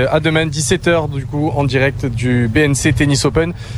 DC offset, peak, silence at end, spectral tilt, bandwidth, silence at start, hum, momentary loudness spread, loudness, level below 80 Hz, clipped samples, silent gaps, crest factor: under 0.1%; 0 dBFS; 0 s; -5 dB/octave; 14 kHz; 0 s; none; 5 LU; -15 LUFS; -32 dBFS; under 0.1%; none; 14 dB